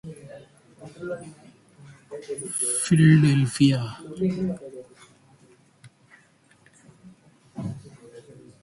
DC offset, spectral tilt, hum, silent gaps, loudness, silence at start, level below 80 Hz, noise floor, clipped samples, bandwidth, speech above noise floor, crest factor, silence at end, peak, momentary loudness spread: under 0.1%; -5.5 dB/octave; none; none; -23 LUFS; 0.05 s; -60 dBFS; -59 dBFS; under 0.1%; 11.5 kHz; 37 dB; 20 dB; 0.4 s; -6 dBFS; 27 LU